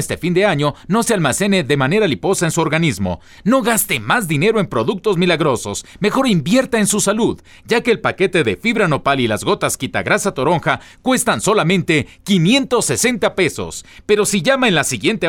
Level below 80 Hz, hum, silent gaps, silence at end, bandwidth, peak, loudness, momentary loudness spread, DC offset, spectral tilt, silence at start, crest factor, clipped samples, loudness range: -46 dBFS; none; none; 0 s; 17.5 kHz; -2 dBFS; -16 LUFS; 5 LU; under 0.1%; -4.5 dB/octave; 0 s; 14 dB; under 0.1%; 1 LU